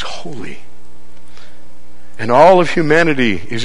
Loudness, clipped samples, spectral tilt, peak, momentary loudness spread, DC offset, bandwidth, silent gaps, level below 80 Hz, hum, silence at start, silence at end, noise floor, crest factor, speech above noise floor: -11 LUFS; 0.2%; -5.5 dB/octave; 0 dBFS; 21 LU; 10%; 11 kHz; none; -46 dBFS; 60 Hz at -50 dBFS; 0 s; 0 s; -45 dBFS; 16 dB; 33 dB